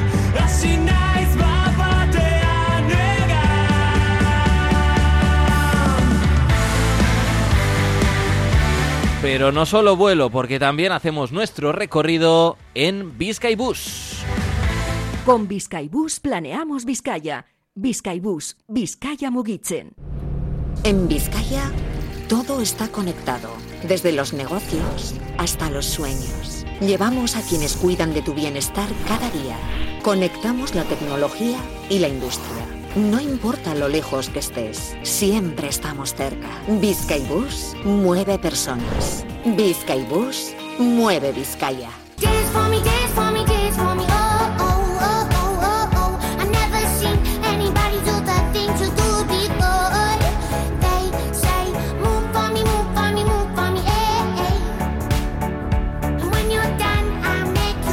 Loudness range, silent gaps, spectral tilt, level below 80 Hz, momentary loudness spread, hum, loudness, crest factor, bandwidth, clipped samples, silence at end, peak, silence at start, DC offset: 6 LU; none; -5 dB/octave; -26 dBFS; 9 LU; none; -20 LUFS; 18 dB; 17 kHz; under 0.1%; 0 s; -2 dBFS; 0 s; under 0.1%